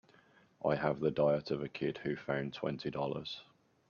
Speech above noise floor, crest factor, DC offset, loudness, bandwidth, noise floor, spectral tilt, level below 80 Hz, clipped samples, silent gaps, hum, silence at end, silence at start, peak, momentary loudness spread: 31 dB; 20 dB; under 0.1%; -36 LUFS; 7 kHz; -66 dBFS; -7.5 dB/octave; -68 dBFS; under 0.1%; none; none; 0.45 s; 0.6 s; -18 dBFS; 8 LU